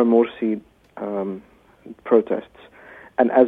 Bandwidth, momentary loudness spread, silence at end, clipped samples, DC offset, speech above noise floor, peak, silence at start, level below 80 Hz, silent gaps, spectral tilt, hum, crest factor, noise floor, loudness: 4 kHz; 22 LU; 0 s; under 0.1%; under 0.1%; 22 dB; -2 dBFS; 0 s; -64 dBFS; none; -9 dB/octave; none; 20 dB; -42 dBFS; -22 LUFS